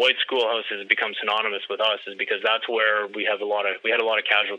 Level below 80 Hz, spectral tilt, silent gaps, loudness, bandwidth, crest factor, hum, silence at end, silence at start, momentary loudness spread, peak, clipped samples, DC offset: under -90 dBFS; -2.5 dB/octave; none; -23 LUFS; 9.4 kHz; 22 dB; none; 0 s; 0 s; 5 LU; -2 dBFS; under 0.1%; under 0.1%